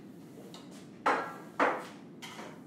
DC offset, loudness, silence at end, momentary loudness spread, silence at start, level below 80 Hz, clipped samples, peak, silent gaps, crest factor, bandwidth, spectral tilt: under 0.1%; -33 LUFS; 0 s; 19 LU; 0 s; -82 dBFS; under 0.1%; -14 dBFS; none; 22 dB; 16 kHz; -4.5 dB/octave